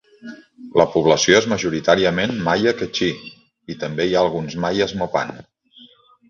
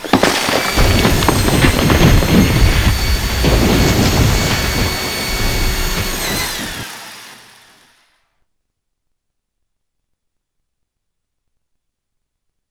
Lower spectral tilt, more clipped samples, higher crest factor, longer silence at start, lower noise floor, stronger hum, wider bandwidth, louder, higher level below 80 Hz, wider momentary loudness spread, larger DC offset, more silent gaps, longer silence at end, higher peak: about the same, -4 dB/octave vs -4.5 dB/octave; neither; about the same, 20 dB vs 16 dB; first, 0.25 s vs 0 s; second, -50 dBFS vs -73 dBFS; neither; second, 7.4 kHz vs over 20 kHz; second, -19 LUFS vs -14 LUFS; second, -50 dBFS vs -22 dBFS; first, 19 LU vs 8 LU; neither; neither; second, 0.45 s vs 5.35 s; about the same, 0 dBFS vs 0 dBFS